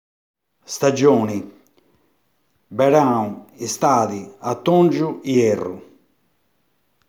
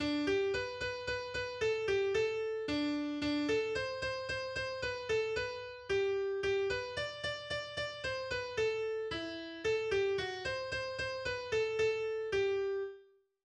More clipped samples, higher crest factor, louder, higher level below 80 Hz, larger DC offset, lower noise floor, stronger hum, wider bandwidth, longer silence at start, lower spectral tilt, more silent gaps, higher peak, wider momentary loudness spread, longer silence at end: neither; first, 20 dB vs 14 dB; first, -19 LUFS vs -36 LUFS; second, -68 dBFS vs -60 dBFS; neither; first, -68 dBFS vs -62 dBFS; neither; first, 19.5 kHz vs 9.8 kHz; first, 0.7 s vs 0 s; first, -6 dB/octave vs -4.5 dB/octave; neither; first, -2 dBFS vs -22 dBFS; first, 15 LU vs 6 LU; first, 1.3 s vs 0.4 s